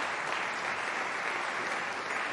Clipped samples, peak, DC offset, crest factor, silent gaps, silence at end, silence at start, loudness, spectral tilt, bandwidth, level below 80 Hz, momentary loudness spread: under 0.1%; -18 dBFS; under 0.1%; 16 dB; none; 0 s; 0 s; -32 LUFS; -1.5 dB/octave; 11.5 kHz; -82 dBFS; 1 LU